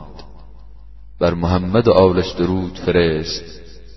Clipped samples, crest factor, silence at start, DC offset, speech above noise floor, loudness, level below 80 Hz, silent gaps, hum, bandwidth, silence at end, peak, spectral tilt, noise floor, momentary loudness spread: under 0.1%; 18 dB; 0 s; 1%; 24 dB; -17 LUFS; -38 dBFS; none; none; 6.2 kHz; 0.05 s; 0 dBFS; -7 dB/octave; -40 dBFS; 12 LU